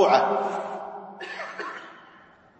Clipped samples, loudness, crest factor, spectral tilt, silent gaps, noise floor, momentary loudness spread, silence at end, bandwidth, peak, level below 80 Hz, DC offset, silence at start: under 0.1%; -28 LUFS; 22 dB; -4.5 dB/octave; none; -53 dBFS; 20 LU; 0.55 s; 8.6 kHz; -4 dBFS; -78 dBFS; under 0.1%; 0 s